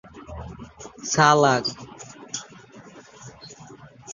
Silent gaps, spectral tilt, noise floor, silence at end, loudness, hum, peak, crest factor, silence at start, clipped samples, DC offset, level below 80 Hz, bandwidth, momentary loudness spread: none; -3.5 dB/octave; -46 dBFS; 0 s; -21 LUFS; none; -2 dBFS; 24 dB; 0.15 s; under 0.1%; under 0.1%; -52 dBFS; 7.6 kHz; 27 LU